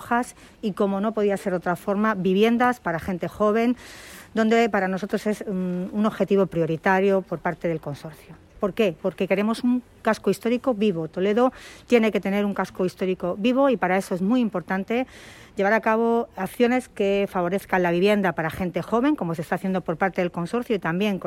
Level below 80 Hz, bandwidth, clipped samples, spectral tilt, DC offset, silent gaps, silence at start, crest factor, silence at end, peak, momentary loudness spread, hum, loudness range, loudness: -56 dBFS; 16 kHz; under 0.1%; -6.5 dB/octave; under 0.1%; none; 0 s; 18 dB; 0 s; -6 dBFS; 8 LU; none; 2 LU; -23 LUFS